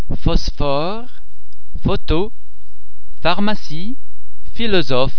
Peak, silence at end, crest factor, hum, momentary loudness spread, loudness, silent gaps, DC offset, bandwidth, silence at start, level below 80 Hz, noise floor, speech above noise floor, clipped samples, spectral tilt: 0 dBFS; 0 s; 18 dB; none; 16 LU; -21 LUFS; none; 30%; 5.4 kHz; 0.05 s; -26 dBFS; -37 dBFS; 22 dB; under 0.1%; -6.5 dB/octave